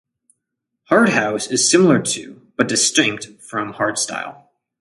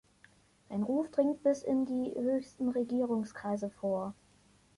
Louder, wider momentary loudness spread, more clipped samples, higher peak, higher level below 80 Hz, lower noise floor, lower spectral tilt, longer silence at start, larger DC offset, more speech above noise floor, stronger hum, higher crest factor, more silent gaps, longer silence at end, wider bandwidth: first, -17 LUFS vs -33 LUFS; first, 14 LU vs 7 LU; neither; first, 0 dBFS vs -16 dBFS; first, -62 dBFS vs -72 dBFS; first, -78 dBFS vs -65 dBFS; second, -3 dB/octave vs -7.5 dB/octave; first, 0.9 s vs 0.7 s; neither; first, 61 dB vs 33 dB; second, none vs 50 Hz at -65 dBFS; about the same, 18 dB vs 18 dB; neither; second, 0.45 s vs 0.65 s; about the same, 11.5 kHz vs 11.5 kHz